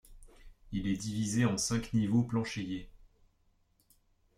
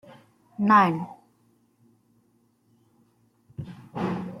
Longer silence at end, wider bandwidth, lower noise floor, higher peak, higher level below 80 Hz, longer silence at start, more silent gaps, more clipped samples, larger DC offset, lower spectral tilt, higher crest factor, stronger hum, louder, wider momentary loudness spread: first, 1.3 s vs 0 s; first, 14.5 kHz vs 12.5 kHz; first, -71 dBFS vs -66 dBFS; second, -16 dBFS vs -8 dBFS; first, -54 dBFS vs -68 dBFS; second, 0.1 s vs 0.6 s; neither; neither; neither; second, -5 dB/octave vs -7.5 dB/octave; about the same, 18 dB vs 22 dB; neither; second, -33 LUFS vs -23 LUFS; second, 10 LU vs 24 LU